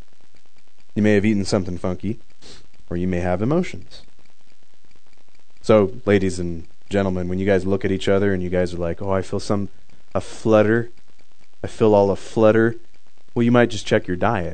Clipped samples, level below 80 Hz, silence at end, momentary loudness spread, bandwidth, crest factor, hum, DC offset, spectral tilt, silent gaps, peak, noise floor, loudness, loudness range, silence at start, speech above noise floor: under 0.1%; -48 dBFS; 0 s; 14 LU; 9.4 kHz; 20 dB; none; 4%; -7 dB/octave; none; 0 dBFS; -61 dBFS; -20 LUFS; 7 LU; 0.95 s; 41 dB